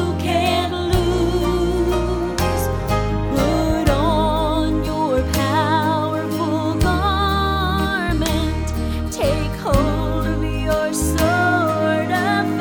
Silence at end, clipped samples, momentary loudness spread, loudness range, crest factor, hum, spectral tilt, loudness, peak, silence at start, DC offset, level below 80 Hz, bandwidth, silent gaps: 0 s; under 0.1%; 4 LU; 2 LU; 16 dB; none; -5.5 dB/octave; -19 LUFS; -2 dBFS; 0 s; under 0.1%; -26 dBFS; over 20 kHz; none